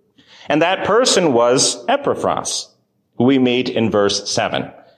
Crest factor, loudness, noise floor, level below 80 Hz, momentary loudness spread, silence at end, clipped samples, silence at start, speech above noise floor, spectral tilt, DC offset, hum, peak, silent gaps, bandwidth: 14 dB; -16 LUFS; -57 dBFS; -54 dBFS; 8 LU; 0.25 s; under 0.1%; 0.5 s; 41 dB; -3.5 dB/octave; under 0.1%; none; -4 dBFS; none; 14.5 kHz